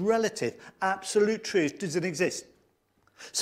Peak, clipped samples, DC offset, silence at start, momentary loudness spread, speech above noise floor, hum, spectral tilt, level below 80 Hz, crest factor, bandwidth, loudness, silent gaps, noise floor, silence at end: -12 dBFS; under 0.1%; under 0.1%; 0 s; 8 LU; 41 dB; none; -4 dB/octave; -70 dBFS; 16 dB; 15.5 kHz; -29 LUFS; none; -69 dBFS; 0 s